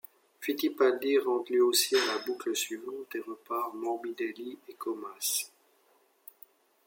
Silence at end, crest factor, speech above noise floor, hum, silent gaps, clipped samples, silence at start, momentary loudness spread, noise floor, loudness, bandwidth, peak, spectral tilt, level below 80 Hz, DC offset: 1.4 s; 18 dB; 37 dB; none; none; under 0.1%; 0.4 s; 16 LU; -68 dBFS; -30 LUFS; 17 kHz; -12 dBFS; -0.5 dB/octave; -88 dBFS; under 0.1%